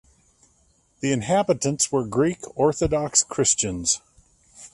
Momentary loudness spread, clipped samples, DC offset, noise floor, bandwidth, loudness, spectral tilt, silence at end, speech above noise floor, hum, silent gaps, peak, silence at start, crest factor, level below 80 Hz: 6 LU; under 0.1%; under 0.1%; -62 dBFS; 11.5 kHz; -22 LUFS; -3.5 dB/octave; 0.05 s; 40 dB; none; none; -4 dBFS; 1 s; 20 dB; -48 dBFS